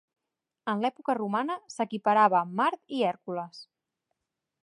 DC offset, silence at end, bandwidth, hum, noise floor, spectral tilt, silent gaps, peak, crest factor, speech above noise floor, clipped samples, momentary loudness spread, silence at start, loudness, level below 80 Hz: under 0.1%; 1 s; 11.5 kHz; none; -84 dBFS; -5.5 dB/octave; none; -10 dBFS; 20 dB; 56 dB; under 0.1%; 14 LU; 0.65 s; -28 LUFS; -84 dBFS